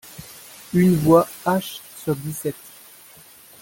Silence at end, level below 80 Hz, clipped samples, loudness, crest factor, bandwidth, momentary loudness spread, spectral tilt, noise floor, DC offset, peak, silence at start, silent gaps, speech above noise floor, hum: 1.1 s; -54 dBFS; under 0.1%; -20 LUFS; 20 dB; 17 kHz; 23 LU; -6.5 dB/octave; -47 dBFS; under 0.1%; -2 dBFS; 0.2 s; none; 28 dB; none